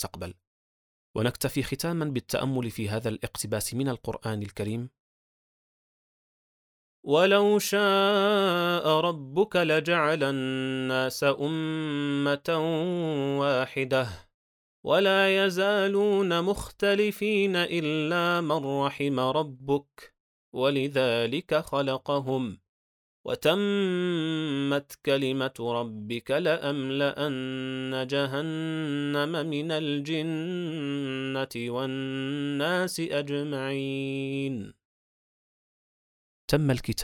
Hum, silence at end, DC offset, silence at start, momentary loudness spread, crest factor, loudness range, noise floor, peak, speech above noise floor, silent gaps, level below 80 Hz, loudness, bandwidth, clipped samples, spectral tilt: none; 0 s; under 0.1%; 0 s; 9 LU; 18 dB; 7 LU; under -90 dBFS; -10 dBFS; over 63 dB; 0.47-1.14 s, 5.00-7.03 s, 14.34-14.83 s, 20.20-20.52 s, 22.69-23.24 s, 34.85-36.48 s; -58 dBFS; -27 LUFS; 19 kHz; under 0.1%; -5 dB/octave